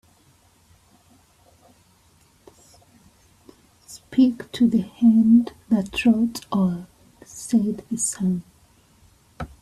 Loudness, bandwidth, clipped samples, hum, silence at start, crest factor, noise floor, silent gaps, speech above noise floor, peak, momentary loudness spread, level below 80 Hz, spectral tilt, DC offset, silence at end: -21 LUFS; 13.5 kHz; under 0.1%; none; 3.9 s; 18 dB; -58 dBFS; none; 38 dB; -6 dBFS; 20 LU; -54 dBFS; -5.5 dB/octave; under 0.1%; 0.15 s